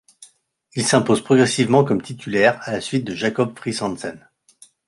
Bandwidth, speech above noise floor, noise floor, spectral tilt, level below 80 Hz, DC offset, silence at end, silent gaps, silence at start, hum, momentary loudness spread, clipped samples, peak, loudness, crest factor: 11.5 kHz; 38 dB; -57 dBFS; -5 dB/octave; -58 dBFS; under 0.1%; 0.7 s; none; 0.2 s; none; 10 LU; under 0.1%; -2 dBFS; -19 LUFS; 18 dB